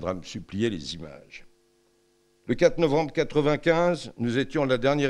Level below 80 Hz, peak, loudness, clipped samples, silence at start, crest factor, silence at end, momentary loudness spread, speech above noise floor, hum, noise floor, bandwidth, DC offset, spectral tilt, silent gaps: -50 dBFS; -6 dBFS; -25 LUFS; under 0.1%; 0 s; 20 dB; 0 s; 15 LU; 40 dB; none; -65 dBFS; 11 kHz; under 0.1%; -6 dB/octave; none